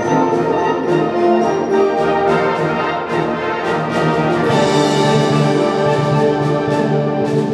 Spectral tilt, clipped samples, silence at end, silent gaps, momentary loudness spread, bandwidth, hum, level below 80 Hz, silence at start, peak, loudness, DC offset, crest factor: -6.5 dB/octave; under 0.1%; 0 s; none; 4 LU; 12 kHz; none; -50 dBFS; 0 s; -2 dBFS; -15 LUFS; under 0.1%; 12 dB